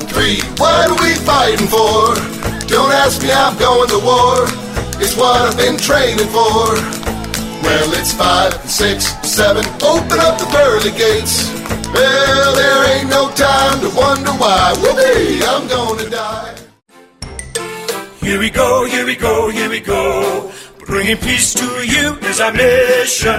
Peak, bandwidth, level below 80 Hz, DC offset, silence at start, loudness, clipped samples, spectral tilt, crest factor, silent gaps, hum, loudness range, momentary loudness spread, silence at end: 0 dBFS; 16.5 kHz; -32 dBFS; under 0.1%; 0 s; -12 LUFS; under 0.1%; -3 dB/octave; 14 dB; none; none; 5 LU; 10 LU; 0 s